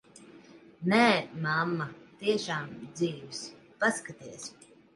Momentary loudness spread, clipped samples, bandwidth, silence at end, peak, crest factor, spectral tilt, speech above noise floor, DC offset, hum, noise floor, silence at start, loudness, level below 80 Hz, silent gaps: 19 LU; under 0.1%; 11.5 kHz; 0.45 s; -10 dBFS; 22 dB; -4.5 dB/octave; 24 dB; under 0.1%; none; -54 dBFS; 0.2 s; -30 LUFS; -74 dBFS; none